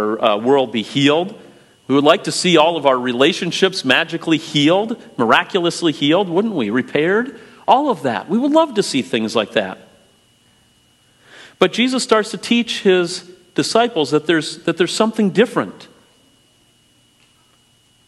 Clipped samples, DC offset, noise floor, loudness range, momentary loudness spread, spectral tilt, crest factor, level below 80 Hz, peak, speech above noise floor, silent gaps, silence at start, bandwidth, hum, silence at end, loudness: under 0.1%; under 0.1%; -56 dBFS; 5 LU; 7 LU; -4.5 dB/octave; 18 dB; -66 dBFS; 0 dBFS; 39 dB; none; 0 s; 12.5 kHz; none; 2.25 s; -16 LUFS